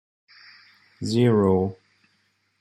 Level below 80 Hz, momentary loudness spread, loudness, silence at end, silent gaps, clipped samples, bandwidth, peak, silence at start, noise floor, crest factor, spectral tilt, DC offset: -64 dBFS; 12 LU; -22 LUFS; 0.85 s; none; under 0.1%; 12 kHz; -8 dBFS; 1 s; -68 dBFS; 16 dB; -7.5 dB/octave; under 0.1%